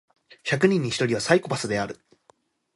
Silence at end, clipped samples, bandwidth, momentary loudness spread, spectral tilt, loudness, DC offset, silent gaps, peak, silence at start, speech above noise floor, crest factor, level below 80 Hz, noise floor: 0.85 s; under 0.1%; 11.5 kHz; 13 LU; -5 dB/octave; -24 LUFS; under 0.1%; none; -4 dBFS; 0.45 s; 39 dB; 22 dB; -60 dBFS; -62 dBFS